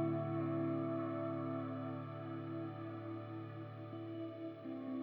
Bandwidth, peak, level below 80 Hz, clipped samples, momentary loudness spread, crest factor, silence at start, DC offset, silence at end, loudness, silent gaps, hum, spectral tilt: 4.6 kHz; -26 dBFS; under -90 dBFS; under 0.1%; 9 LU; 16 dB; 0 s; under 0.1%; 0 s; -43 LUFS; none; none; -10.5 dB/octave